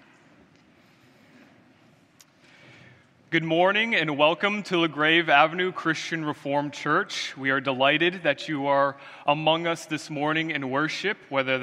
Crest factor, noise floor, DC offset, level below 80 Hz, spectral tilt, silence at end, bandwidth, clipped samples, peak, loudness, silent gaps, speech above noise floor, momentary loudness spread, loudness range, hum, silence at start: 22 dB; -58 dBFS; under 0.1%; -76 dBFS; -4.5 dB/octave; 0 s; 13 kHz; under 0.1%; -4 dBFS; -24 LUFS; none; 34 dB; 8 LU; 5 LU; none; 3.3 s